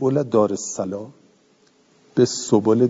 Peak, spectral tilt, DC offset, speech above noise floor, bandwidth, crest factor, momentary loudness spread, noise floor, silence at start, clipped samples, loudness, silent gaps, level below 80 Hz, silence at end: -2 dBFS; -6 dB/octave; under 0.1%; 39 dB; 7.8 kHz; 18 dB; 12 LU; -58 dBFS; 0 s; under 0.1%; -21 LUFS; none; -68 dBFS; 0 s